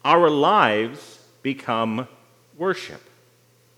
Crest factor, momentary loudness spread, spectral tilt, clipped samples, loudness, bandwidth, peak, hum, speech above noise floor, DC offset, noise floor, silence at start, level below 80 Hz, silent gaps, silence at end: 22 dB; 18 LU; -5.5 dB/octave; under 0.1%; -21 LUFS; 15 kHz; 0 dBFS; none; 38 dB; under 0.1%; -58 dBFS; 0.05 s; -76 dBFS; none; 0.8 s